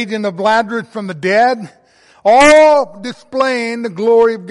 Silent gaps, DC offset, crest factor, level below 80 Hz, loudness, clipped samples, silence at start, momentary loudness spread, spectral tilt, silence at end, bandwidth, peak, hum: none; under 0.1%; 12 dB; -48 dBFS; -12 LUFS; under 0.1%; 0 s; 16 LU; -4 dB/octave; 0 s; 11.5 kHz; 0 dBFS; none